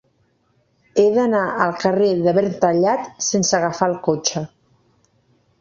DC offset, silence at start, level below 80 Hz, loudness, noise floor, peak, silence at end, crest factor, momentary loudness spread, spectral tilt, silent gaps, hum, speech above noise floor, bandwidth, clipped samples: under 0.1%; 0.95 s; -60 dBFS; -18 LUFS; -63 dBFS; -2 dBFS; 1.15 s; 18 dB; 5 LU; -4.5 dB/octave; none; none; 45 dB; 7.6 kHz; under 0.1%